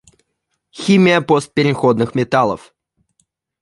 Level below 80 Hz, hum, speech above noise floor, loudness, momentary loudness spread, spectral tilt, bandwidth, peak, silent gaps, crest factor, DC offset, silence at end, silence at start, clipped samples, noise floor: -54 dBFS; none; 58 dB; -15 LUFS; 8 LU; -6 dB/octave; 11.5 kHz; -2 dBFS; none; 16 dB; under 0.1%; 1.05 s; 0.75 s; under 0.1%; -72 dBFS